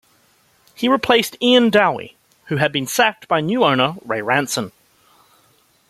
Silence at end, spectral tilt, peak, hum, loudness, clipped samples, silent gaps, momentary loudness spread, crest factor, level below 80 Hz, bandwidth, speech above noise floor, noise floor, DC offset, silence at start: 1.2 s; -4 dB/octave; 0 dBFS; none; -17 LUFS; under 0.1%; none; 11 LU; 18 dB; -60 dBFS; 15 kHz; 40 dB; -57 dBFS; under 0.1%; 0.8 s